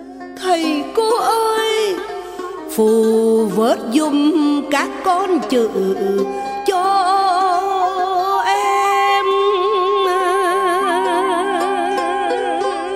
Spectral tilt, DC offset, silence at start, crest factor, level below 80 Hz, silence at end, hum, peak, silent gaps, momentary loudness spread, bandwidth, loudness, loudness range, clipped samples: -4 dB/octave; under 0.1%; 0 s; 12 dB; -56 dBFS; 0 s; none; -4 dBFS; none; 5 LU; 16 kHz; -16 LUFS; 1 LU; under 0.1%